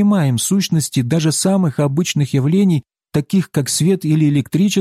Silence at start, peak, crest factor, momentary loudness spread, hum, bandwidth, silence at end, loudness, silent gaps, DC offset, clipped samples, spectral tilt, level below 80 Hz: 0 s; -4 dBFS; 10 dB; 3 LU; none; 15.5 kHz; 0 s; -16 LUFS; none; under 0.1%; under 0.1%; -5.5 dB/octave; -54 dBFS